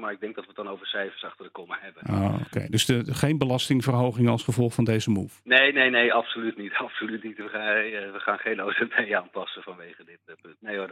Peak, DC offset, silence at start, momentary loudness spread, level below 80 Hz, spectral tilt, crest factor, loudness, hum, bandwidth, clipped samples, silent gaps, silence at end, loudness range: -4 dBFS; under 0.1%; 0 s; 17 LU; -62 dBFS; -5 dB/octave; 22 dB; -25 LUFS; none; 16 kHz; under 0.1%; none; 0 s; 6 LU